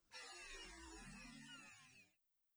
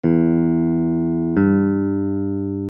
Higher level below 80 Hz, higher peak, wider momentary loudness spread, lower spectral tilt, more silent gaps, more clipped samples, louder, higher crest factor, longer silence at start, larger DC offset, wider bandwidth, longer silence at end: second, -70 dBFS vs -46 dBFS; second, -44 dBFS vs -4 dBFS; first, 10 LU vs 6 LU; second, -2 dB/octave vs -13.5 dB/octave; neither; neither; second, -57 LUFS vs -19 LUFS; about the same, 16 dB vs 14 dB; about the same, 0 s vs 0.05 s; neither; first, over 20 kHz vs 3.1 kHz; first, 0.45 s vs 0 s